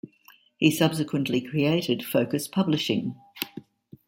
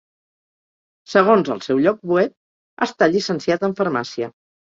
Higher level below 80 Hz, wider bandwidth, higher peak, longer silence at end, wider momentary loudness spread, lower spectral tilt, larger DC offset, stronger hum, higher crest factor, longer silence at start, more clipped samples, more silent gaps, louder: about the same, -66 dBFS vs -64 dBFS; first, 16.5 kHz vs 7.8 kHz; second, -6 dBFS vs -2 dBFS; about the same, 0.45 s vs 0.4 s; about the same, 12 LU vs 10 LU; about the same, -5.5 dB/octave vs -6 dB/octave; neither; neither; about the same, 20 dB vs 18 dB; second, 0.05 s vs 1.1 s; neither; second, none vs 2.37-2.77 s; second, -26 LUFS vs -19 LUFS